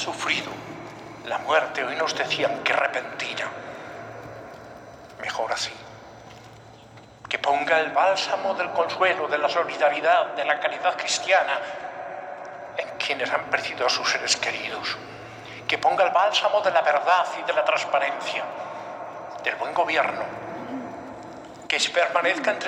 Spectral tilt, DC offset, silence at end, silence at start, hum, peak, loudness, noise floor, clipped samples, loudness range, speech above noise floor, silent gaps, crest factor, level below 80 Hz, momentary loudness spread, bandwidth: -2 dB/octave; under 0.1%; 0 s; 0 s; none; -6 dBFS; -24 LUFS; -47 dBFS; under 0.1%; 7 LU; 23 dB; none; 20 dB; -68 dBFS; 18 LU; 15 kHz